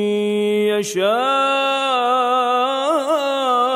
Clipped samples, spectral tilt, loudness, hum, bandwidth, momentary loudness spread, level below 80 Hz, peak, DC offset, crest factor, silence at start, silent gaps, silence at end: under 0.1%; -3.5 dB/octave; -18 LUFS; none; 15.5 kHz; 2 LU; -76 dBFS; -6 dBFS; under 0.1%; 12 dB; 0 s; none; 0 s